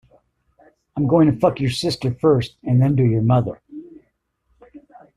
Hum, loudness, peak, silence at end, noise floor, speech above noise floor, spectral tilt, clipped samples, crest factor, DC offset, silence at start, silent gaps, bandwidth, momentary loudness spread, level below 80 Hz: none; -18 LUFS; -2 dBFS; 0.4 s; -67 dBFS; 50 dB; -7.5 dB/octave; under 0.1%; 18 dB; under 0.1%; 0.95 s; none; 11.5 kHz; 17 LU; -50 dBFS